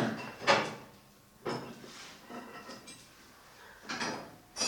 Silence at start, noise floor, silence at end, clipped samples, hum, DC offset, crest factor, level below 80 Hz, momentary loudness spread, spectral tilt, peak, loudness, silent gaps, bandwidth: 0 s; -59 dBFS; 0 s; under 0.1%; none; under 0.1%; 26 dB; -72 dBFS; 25 LU; -3 dB/octave; -12 dBFS; -36 LUFS; none; 19 kHz